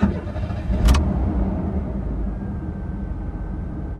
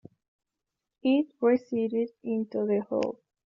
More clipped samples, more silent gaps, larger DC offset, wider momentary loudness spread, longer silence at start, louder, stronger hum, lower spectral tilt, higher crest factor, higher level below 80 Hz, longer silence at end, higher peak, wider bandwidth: neither; neither; neither; first, 11 LU vs 7 LU; second, 0 s vs 1.05 s; first, -25 LUFS vs -28 LUFS; neither; first, -7.5 dB/octave vs -5.5 dB/octave; about the same, 18 dB vs 16 dB; first, -24 dBFS vs -76 dBFS; second, 0 s vs 0.4 s; first, -4 dBFS vs -14 dBFS; first, 13 kHz vs 7.2 kHz